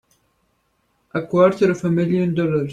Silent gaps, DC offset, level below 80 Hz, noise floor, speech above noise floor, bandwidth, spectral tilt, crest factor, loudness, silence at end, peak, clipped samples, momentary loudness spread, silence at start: none; under 0.1%; -56 dBFS; -66 dBFS; 49 dB; 9 kHz; -8 dB/octave; 16 dB; -19 LUFS; 0 s; -4 dBFS; under 0.1%; 10 LU; 1.15 s